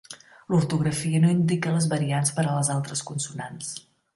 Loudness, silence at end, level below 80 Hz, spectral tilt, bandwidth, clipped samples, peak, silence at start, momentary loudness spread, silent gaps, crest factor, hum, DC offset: -25 LUFS; 0.35 s; -62 dBFS; -5.5 dB/octave; 11.5 kHz; under 0.1%; -10 dBFS; 0.1 s; 14 LU; none; 16 dB; none; under 0.1%